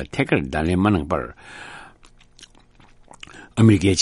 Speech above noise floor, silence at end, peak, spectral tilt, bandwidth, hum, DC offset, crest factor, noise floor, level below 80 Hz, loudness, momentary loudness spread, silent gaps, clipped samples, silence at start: 32 dB; 0 s; -2 dBFS; -6 dB/octave; 11.5 kHz; none; under 0.1%; 20 dB; -51 dBFS; -42 dBFS; -20 LUFS; 24 LU; none; under 0.1%; 0 s